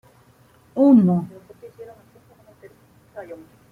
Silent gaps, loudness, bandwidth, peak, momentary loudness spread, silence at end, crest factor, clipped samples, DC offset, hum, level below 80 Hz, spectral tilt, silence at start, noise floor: none; -17 LUFS; 4.3 kHz; -4 dBFS; 28 LU; 0.35 s; 18 dB; under 0.1%; under 0.1%; none; -64 dBFS; -11 dB/octave; 0.75 s; -54 dBFS